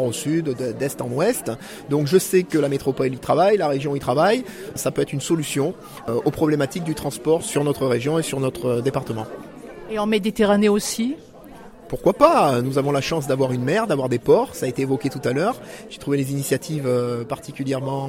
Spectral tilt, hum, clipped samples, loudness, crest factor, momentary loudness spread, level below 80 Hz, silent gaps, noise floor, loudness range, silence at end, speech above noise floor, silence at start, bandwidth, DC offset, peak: -5.5 dB/octave; none; under 0.1%; -21 LUFS; 20 dB; 11 LU; -52 dBFS; none; -42 dBFS; 4 LU; 0 s; 21 dB; 0 s; 16.5 kHz; under 0.1%; 0 dBFS